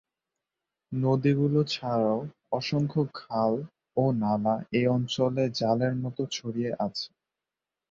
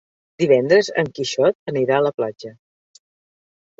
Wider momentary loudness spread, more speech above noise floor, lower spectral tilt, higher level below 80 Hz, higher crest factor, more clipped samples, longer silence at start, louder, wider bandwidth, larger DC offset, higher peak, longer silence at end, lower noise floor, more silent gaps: second, 8 LU vs 12 LU; second, 62 dB vs over 72 dB; first, -7 dB/octave vs -5 dB/octave; about the same, -64 dBFS vs -64 dBFS; about the same, 16 dB vs 18 dB; neither; first, 0.9 s vs 0.4 s; second, -28 LUFS vs -19 LUFS; about the same, 7.6 kHz vs 8 kHz; neither; second, -12 dBFS vs -2 dBFS; second, 0.85 s vs 1.3 s; about the same, -89 dBFS vs under -90 dBFS; second, none vs 1.55-1.66 s, 2.14-2.18 s